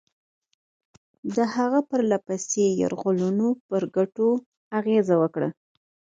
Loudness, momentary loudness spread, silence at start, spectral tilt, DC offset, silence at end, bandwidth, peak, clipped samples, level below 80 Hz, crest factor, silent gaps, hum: -24 LUFS; 7 LU; 1.25 s; -6 dB/octave; under 0.1%; 0.6 s; 9.4 kHz; -8 dBFS; under 0.1%; -70 dBFS; 16 dB; 3.60-3.69 s, 4.46-4.71 s; none